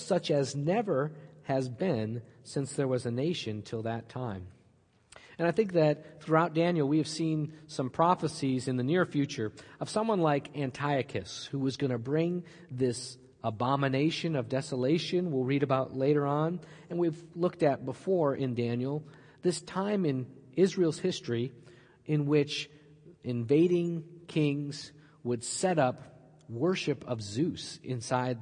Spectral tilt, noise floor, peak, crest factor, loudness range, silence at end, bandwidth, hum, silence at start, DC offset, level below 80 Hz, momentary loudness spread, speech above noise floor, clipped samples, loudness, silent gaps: -6 dB/octave; -65 dBFS; -10 dBFS; 20 dB; 3 LU; 0 s; 10.5 kHz; none; 0 s; under 0.1%; -72 dBFS; 11 LU; 35 dB; under 0.1%; -31 LUFS; none